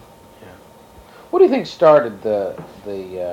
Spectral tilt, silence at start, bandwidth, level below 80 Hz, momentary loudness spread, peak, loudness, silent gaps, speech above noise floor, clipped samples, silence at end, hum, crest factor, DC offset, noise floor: -6.5 dB/octave; 0.45 s; 13.5 kHz; -56 dBFS; 18 LU; -2 dBFS; -16 LUFS; none; 28 dB; under 0.1%; 0 s; none; 18 dB; under 0.1%; -44 dBFS